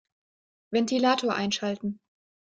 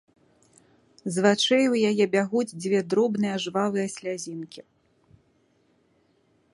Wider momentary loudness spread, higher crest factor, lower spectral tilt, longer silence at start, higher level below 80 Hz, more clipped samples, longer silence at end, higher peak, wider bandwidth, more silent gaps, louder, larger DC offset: second, 11 LU vs 14 LU; about the same, 18 dB vs 22 dB; about the same, -4 dB/octave vs -4.5 dB/octave; second, 0.7 s vs 1.05 s; about the same, -70 dBFS vs -72 dBFS; neither; second, 0.55 s vs 1.95 s; second, -10 dBFS vs -4 dBFS; second, 9.4 kHz vs 11.5 kHz; neither; second, -27 LUFS vs -24 LUFS; neither